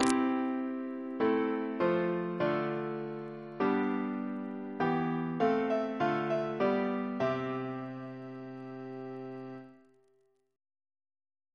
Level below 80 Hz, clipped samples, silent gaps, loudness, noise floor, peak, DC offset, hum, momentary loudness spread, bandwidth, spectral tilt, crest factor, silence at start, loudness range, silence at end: -72 dBFS; under 0.1%; none; -33 LUFS; -72 dBFS; -8 dBFS; under 0.1%; none; 14 LU; 11 kHz; -6.5 dB/octave; 24 dB; 0 s; 12 LU; 1.8 s